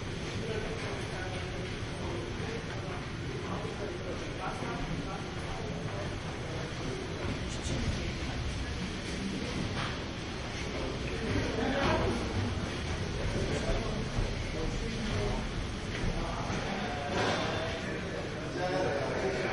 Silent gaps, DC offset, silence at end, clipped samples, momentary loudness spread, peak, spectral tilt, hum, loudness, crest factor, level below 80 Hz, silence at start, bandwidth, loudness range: none; under 0.1%; 0 s; under 0.1%; 6 LU; -18 dBFS; -5 dB/octave; none; -35 LUFS; 16 dB; -42 dBFS; 0 s; 11.5 kHz; 4 LU